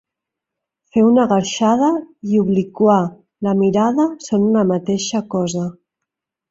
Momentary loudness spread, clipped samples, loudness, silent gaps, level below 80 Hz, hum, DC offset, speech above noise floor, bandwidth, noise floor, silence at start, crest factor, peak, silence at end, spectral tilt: 8 LU; under 0.1%; -17 LUFS; none; -58 dBFS; none; under 0.1%; 67 dB; 8 kHz; -83 dBFS; 0.95 s; 14 dB; -2 dBFS; 0.8 s; -6 dB/octave